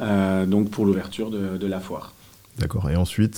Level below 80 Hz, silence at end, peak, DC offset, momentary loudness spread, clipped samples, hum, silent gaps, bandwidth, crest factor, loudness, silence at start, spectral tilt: -44 dBFS; 0 s; -8 dBFS; under 0.1%; 14 LU; under 0.1%; none; none; 17 kHz; 16 dB; -24 LUFS; 0 s; -7 dB/octave